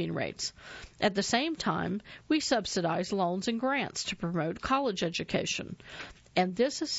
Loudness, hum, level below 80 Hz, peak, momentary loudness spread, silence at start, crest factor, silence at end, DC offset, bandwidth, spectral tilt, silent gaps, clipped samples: -31 LUFS; none; -58 dBFS; -12 dBFS; 10 LU; 0 s; 18 dB; 0 s; under 0.1%; 8.2 kHz; -4 dB/octave; none; under 0.1%